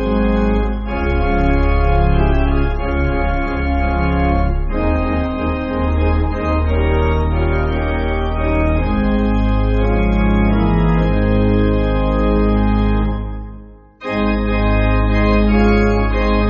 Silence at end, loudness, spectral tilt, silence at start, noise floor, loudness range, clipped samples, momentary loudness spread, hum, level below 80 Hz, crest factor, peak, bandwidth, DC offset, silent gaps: 0 s; -17 LUFS; -7 dB/octave; 0 s; -37 dBFS; 2 LU; under 0.1%; 5 LU; none; -18 dBFS; 12 dB; -2 dBFS; 5.6 kHz; under 0.1%; none